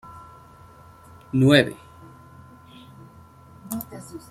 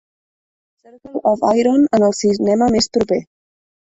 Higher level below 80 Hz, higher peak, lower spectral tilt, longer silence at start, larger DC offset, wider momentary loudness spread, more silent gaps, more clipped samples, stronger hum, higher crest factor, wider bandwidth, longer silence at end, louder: second, -58 dBFS vs -50 dBFS; about the same, -2 dBFS vs -2 dBFS; about the same, -6 dB/octave vs -5 dB/octave; second, 0.1 s vs 1.05 s; neither; first, 27 LU vs 7 LU; neither; neither; neither; first, 24 dB vs 14 dB; first, 16 kHz vs 8.4 kHz; second, 0.15 s vs 0.75 s; second, -21 LUFS vs -16 LUFS